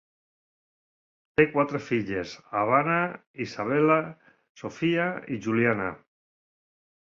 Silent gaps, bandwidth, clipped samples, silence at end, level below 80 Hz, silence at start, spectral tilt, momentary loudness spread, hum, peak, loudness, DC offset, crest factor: 3.27-3.34 s, 4.49-4.55 s; 7.4 kHz; under 0.1%; 1.1 s; -62 dBFS; 1.4 s; -7 dB/octave; 12 LU; none; -6 dBFS; -26 LUFS; under 0.1%; 22 dB